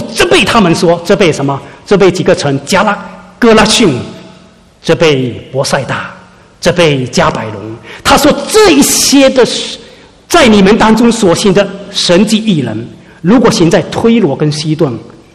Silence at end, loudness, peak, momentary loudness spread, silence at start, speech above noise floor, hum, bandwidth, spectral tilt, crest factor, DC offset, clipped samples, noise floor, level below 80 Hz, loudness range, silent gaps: 0.25 s; -8 LUFS; 0 dBFS; 14 LU; 0 s; 31 dB; none; 15 kHz; -4.5 dB/octave; 8 dB; 0.5%; 2%; -39 dBFS; -34 dBFS; 5 LU; none